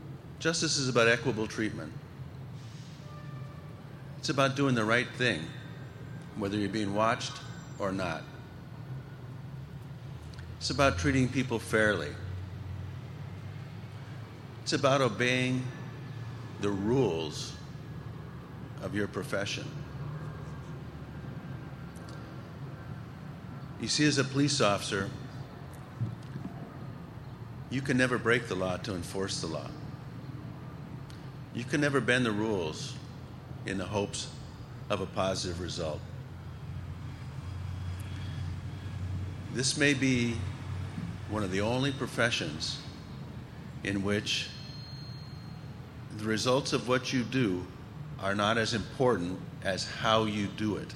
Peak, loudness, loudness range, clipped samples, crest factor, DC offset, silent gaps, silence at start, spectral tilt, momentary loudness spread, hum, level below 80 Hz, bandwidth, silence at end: -10 dBFS; -31 LUFS; 8 LU; under 0.1%; 22 dB; under 0.1%; none; 0 s; -4.5 dB/octave; 17 LU; none; -56 dBFS; 15.5 kHz; 0 s